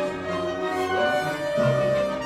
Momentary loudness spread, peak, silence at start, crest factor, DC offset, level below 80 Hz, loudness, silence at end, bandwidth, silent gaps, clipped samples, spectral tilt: 6 LU; -10 dBFS; 0 s; 14 dB; under 0.1%; -54 dBFS; -24 LUFS; 0 s; 14 kHz; none; under 0.1%; -5.5 dB/octave